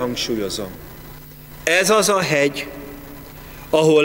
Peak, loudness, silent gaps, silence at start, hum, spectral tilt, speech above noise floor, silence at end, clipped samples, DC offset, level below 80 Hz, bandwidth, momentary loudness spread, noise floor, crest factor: -2 dBFS; -18 LUFS; none; 0 s; none; -3.5 dB/octave; 21 dB; 0 s; under 0.1%; under 0.1%; -46 dBFS; 16.5 kHz; 23 LU; -38 dBFS; 18 dB